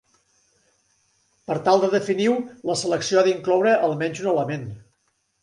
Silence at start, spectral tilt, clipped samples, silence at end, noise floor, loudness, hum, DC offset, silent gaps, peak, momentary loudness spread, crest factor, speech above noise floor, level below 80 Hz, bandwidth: 1.5 s; -5 dB/octave; under 0.1%; 0.65 s; -70 dBFS; -21 LUFS; none; under 0.1%; none; -4 dBFS; 10 LU; 20 dB; 49 dB; -66 dBFS; 11.5 kHz